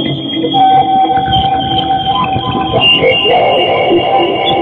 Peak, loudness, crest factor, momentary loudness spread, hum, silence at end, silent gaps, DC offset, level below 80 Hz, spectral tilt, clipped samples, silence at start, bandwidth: 0 dBFS; -10 LUFS; 10 dB; 6 LU; none; 0 s; none; under 0.1%; -36 dBFS; -7 dB/octave; under 0.1%; 0 s; 4.6 kHz